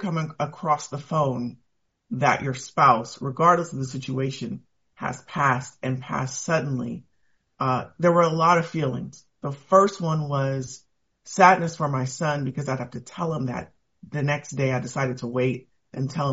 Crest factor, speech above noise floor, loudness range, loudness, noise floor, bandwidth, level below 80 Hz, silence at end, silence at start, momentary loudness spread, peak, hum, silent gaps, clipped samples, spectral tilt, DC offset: 22 dB; 45 dB; 5 LU; -24 LUFS; -69 dBFS; 8 kHz; -62 dBFS; 0 s; 0 s; 16 LU; -2 dBFS; none; none; under 0.1%; -5.5 dB/octave; under 0.1%